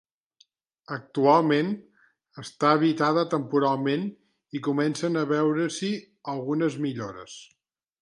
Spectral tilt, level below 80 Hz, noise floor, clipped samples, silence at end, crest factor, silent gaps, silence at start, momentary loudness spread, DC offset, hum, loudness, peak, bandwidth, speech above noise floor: -6 dB/octave; -74 dBFS; -65 dBFS; under 0.1%; 0.6 s; 20 dB; none; 0.9 s; 16 LU; under 0.1%; none; -25 LUFS; -6 dBFS; 11.5 kHz; 40 dB